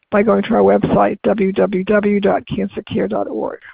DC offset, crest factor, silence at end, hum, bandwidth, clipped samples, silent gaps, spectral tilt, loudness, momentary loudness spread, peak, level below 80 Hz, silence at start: under 0.1%; 14 dB; 0 s; none; 4.8 kHz; under 0.1%; none; -12 dB/octave; -16 LUFS; 9 LU; -2 dBFS; -44 dBFS; 0.1 s